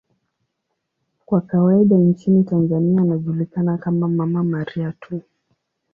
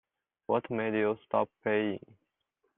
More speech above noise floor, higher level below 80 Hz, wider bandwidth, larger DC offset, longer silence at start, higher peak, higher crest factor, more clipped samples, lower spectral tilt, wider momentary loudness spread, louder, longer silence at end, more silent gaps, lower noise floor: first, 58 dB vs 49 dB; first, -60 dBFS vs -74 dBFS; about the same, 3.6 kHz vs 3.9 kHz; neither; first, 1.3 s vs 0.5 s; first, -4 dBFS vs -14 dBFS; second, 14 dB vs 20 dB; neither; first, -11.5 dB/octave vs -4.5 dB/octave; first, 12 LU vs 7 LU; first, -18 LUFS vs -31 LUFS; about the same, 0.75 s vs 0.8 s; neither; second, -76 dBFS vs -80 dBFS